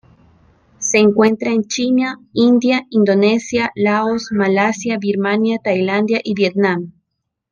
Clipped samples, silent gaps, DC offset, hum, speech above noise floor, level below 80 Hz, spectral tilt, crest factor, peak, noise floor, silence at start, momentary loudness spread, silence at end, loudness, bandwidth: under 0.1%; none; under 0.1%; none; 60 dB; -58 dBFS; -5 dB/octave; 14 dB; -2 dBFS; -75 dBFS; 0.8 s; 6 LU; 0.6 s; -16 LUFS; 10 kHz